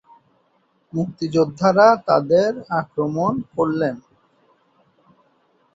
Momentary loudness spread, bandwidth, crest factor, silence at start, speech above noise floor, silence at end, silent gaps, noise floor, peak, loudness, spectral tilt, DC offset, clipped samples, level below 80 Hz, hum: 12 LU; 7.8 kHz; 18 dB; 0.95 s; 45 dB; 1.75 s; none; -63 dBFS; -2 dBFS; -19 LUFS; -7 dB/octave; under 0.1%; under 0.1%; -60 dBFS; none